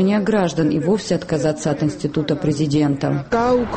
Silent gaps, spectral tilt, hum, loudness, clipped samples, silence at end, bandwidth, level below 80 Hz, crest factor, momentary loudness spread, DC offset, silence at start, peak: none; -6.5 dB/octave; none; -19 LUFS; under 0.1%; 0 s; 8.8 kHz; -46 dBFS; 12 dB; 4 LU; under 0.1%; 0 s; -6 dBFS